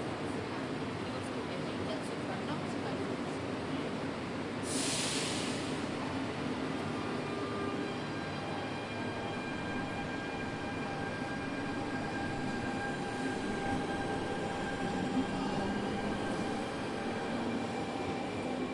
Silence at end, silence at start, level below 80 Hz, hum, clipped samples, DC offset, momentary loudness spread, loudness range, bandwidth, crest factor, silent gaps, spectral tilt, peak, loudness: 0 s; 0 s; -58 dBFS; none; under 0.1%; under 0.1%; 4 LU; 2 LU; 11.5 kHz; 16 dB; none; -4.5 dB/octave; -20 dBFS; -36 LUFS